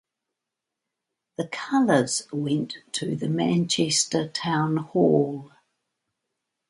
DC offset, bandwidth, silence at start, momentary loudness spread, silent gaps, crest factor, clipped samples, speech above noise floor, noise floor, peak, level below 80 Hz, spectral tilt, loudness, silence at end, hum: under 0.1%; 11.5 kHz; 1.4 s; 11 LU; none; 20 dB; under 0.1%; 62 dB; -85 dBFS; -6 dBFS; -68 dBFS; -4.5 dB/octave; -24 LUFS; 1.2 s; none